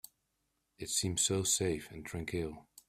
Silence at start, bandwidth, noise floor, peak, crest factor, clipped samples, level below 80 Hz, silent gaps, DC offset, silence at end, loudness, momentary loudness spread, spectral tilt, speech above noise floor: 0.8 s; 16 kHz; -82 dBFS; -18 dBFS; 18 dB; under 0.1%; -60 dBFS; none; under 0.1%; 0.25 s; -34 LUFS; 13 LU; -3 dB/octave; 46 dB